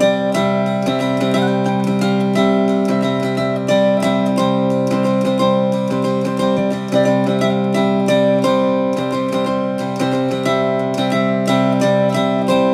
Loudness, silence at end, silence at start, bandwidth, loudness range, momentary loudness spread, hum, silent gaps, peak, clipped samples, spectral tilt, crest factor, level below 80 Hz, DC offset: -16 LUFS; 0 s; 0 s; 14 kHz; 1 LU; 4 LU; none; none; -2 dBFS; under 0.1%; -6.5 dB/octave; 14 dB; -58 dBFS; under 0.1%